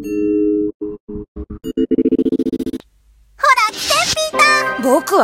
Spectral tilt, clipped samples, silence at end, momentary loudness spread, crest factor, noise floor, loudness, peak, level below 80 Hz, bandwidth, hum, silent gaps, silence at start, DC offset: -3 dB/octave; under 0.1%; 0 s; 18 LU; 16 dB; -51 dBFS; -15 LUFS; 0 dBFS; -42 dBFS; 16.5 kHz; none; 0.74-0.80 s, 1.00-1.07 s, 1.28-1.35 s; 0 s; under 0.1%